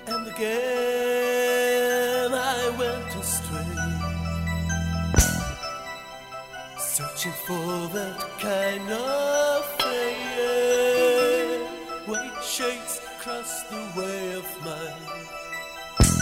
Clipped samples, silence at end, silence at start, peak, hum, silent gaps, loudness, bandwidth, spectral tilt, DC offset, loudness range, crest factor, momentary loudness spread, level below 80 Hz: under 0.1%; 0 s; 0 s; -4 dBFS; none; none; -26 LUFS; 16 kHz; -3.5 dB/octave; under 0.1%; 7 LU; 22 dB; 12 LU; -36 dBFS